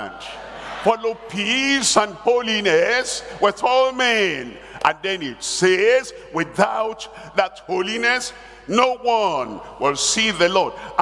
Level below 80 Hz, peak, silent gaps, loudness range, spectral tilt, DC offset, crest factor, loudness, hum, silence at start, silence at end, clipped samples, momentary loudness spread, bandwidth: -54 dBFS; 0 dBFS; none; 3 LU; -2.5 dB/octave; under 0.1%; 20 dB; -19 LUFS; none; 0 s; 0 s; under 0.1%; 12 LU; 12 kHz